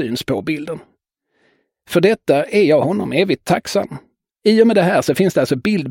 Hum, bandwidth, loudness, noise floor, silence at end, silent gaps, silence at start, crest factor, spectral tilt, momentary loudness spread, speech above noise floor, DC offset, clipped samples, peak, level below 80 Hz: none; 17 kHz; -16 LUFS; -67 dBFS; 0 s; none; 0 s; 16 dB; -6 dB/octave; 11 LU; 51 dB; under 0.1%; under 0.1%; 0 dBFS; -54 dBFS